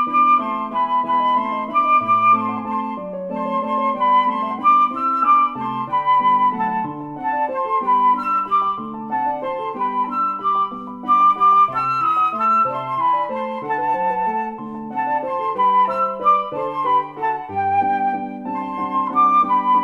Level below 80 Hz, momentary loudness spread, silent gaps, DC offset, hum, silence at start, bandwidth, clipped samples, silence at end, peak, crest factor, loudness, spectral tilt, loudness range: -60 dBFS; 10 LU; none; under 0.1%; none; 0 s; 7.2 kHz; under 0.1%; 0 s; -6 dBFS; 14 dB; -18 LUFS; -6.5 dB/octave; 3 LU